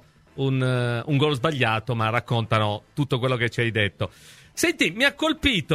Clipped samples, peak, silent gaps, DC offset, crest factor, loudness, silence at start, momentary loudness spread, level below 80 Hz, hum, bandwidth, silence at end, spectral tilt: under 0.1%; -4 dBFS; none; under 0.1%; 20 dB; -23 LUFS; 0.35 s; 7 LU; -48 dBFS; none; 15.5 kHz; 0 s; -5 dB/octave